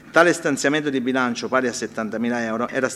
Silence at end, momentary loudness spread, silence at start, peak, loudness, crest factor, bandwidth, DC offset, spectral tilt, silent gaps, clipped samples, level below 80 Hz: 0 s; 8 LU; 0.05 s; -2 dBFS; -21 LUFS; 20 dB; 14 kHz; under 0.1%; -4 dB/octave; none; under 0.1%; -64 dBFS